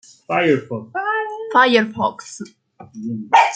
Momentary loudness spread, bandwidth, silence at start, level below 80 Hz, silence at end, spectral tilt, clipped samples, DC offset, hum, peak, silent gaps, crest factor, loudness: 19 LU; 9.4 kHz; 0.3 s; -66 dBFS; 0 s; -4.5 dB/octave; under 0.1%; under 0.1%; none; -2 dBFS; none; 18 dB; -18 LUFS